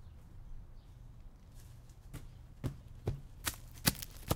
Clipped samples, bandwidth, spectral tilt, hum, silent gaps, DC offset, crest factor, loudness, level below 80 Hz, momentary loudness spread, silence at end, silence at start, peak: under 0.1%; 18 kHz; -3.5 dB/octave; none; none; under 0.1%; 34 dB; -40 LUFS; -52 dBFS; 23 LU; 0 s; 0 s; -10 dBFS